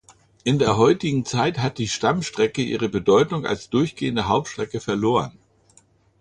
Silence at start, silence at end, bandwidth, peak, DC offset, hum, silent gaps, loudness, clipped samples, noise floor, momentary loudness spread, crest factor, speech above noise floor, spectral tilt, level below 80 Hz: 0.45 s; 0.9 s; 10.5 kHz; -4 dBFS; under 0.1%; none; none; -22 LUFS; under 0.1%; -57 dBFS; 8 LU; 18 dB; 36 dB; -5.5 dB/octave; -50 dBFS